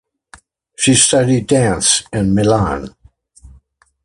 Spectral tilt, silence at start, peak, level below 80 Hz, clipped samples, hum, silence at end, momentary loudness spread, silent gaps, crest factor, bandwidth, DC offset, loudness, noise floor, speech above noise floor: -4 dB/octave; 0.8 s; 0 dBFS; -38 dBFS; under 0.1%; none; 1.15 s; 9 LU; none; 16 dB; 11.5 kHz; under 0.1%; -13 LUFS; -51 dBFS; 38 dB